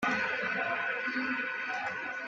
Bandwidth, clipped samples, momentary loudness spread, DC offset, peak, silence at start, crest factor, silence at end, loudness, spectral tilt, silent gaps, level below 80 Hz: 9.6 kHz; under 0.1%; 4 LU; under 0.1%; -18 dBFS; 0 s; 14 dB; 0 s; -32 LUFS; -4 dB/octave; none; -72 dBFS